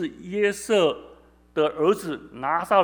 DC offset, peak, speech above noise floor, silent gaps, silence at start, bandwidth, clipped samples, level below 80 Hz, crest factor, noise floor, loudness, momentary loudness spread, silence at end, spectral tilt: under 0.1%; -6 dBFS; 29 dB; none; 0 s; over 20 kHz; under 0.1%; -60 dBFS; 18 dB; -52 dBFS; -24 LUFS; 10 LU; 0 s; -4.5 dB/octave